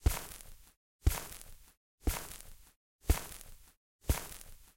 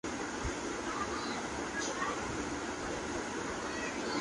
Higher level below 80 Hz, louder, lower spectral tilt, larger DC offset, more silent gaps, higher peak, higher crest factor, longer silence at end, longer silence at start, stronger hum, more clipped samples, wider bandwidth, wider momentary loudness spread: first, -40 dBFS vs -52 dBFS; about the same, -39 LUFS vs -37 LUFS; about the same, -4.5 dB/octave vs -3.5 dB/octave; neither; first, 0.77-0.99 s, 1.77-1.98 s, 2.76-2.99 s, 3.77-3.99 s vs none; first, -14 dBFS vs -22 dBFS; first, 24 dB vs 14 dB; about the same, 0.1 s vs 0 s; about the same, 0 s vs 0.05 s; neither; neither; first, 17 kHz vs 11.5 kHz; first, 18 LU vs 2 LU